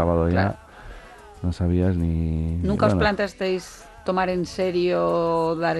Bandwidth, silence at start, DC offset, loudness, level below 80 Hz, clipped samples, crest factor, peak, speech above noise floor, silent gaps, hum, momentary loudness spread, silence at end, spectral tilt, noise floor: 12 kHz; 0 s; under 0.1%; -23 LUFS; -36 dBFS; under 0.1%; 16 dB; -6 dBFS; 21 dB; none; none; 18 LU; 0 s; -7 dB/octave; -43 dBFS